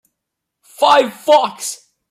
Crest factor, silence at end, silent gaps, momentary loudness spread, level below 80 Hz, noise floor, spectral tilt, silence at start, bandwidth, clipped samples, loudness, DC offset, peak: 16 dB; 0.35 s; none; 14 LU; -70 dBFS; -79 dBFS; -1.5 dB/octave; 0.8 s; 15.5 kHz; under 0.1%; -14 LUFS; under 0.1%; -2 dBFS